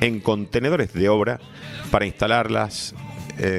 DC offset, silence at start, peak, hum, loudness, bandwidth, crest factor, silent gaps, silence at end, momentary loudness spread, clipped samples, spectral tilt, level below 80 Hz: under 0.1%; 0 s; -2 dBFS; none; -22 LUFS; 15 kHz; 20 dB; none; 0 s; 15 LU; under 0.1%; -5.5 dB/octave; -44 dBFS